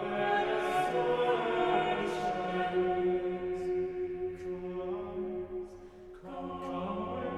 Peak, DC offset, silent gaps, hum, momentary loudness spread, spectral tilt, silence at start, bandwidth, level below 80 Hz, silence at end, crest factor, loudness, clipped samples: -16 dBFS; under 0.1%; none; none; 12 LU; -6 dB/octave; 0 s; 12.5 kHz; -58 dBFS; 0 s; 16 dB; -33 LUFS; under 0.1%